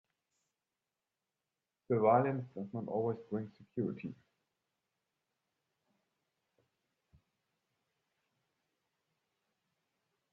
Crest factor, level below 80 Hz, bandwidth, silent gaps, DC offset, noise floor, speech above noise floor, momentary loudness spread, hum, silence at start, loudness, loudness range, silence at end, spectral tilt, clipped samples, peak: 26 dB; -82 dBFS; 4.9 kHz; none; under 0.1%; under -90 dBFS; over 55 dB; 15 LU; none; 1.9 s; -35 LUFS; 12 LU; 6.2 s; -9 dB/octave; under 0.1%; -16 dBFS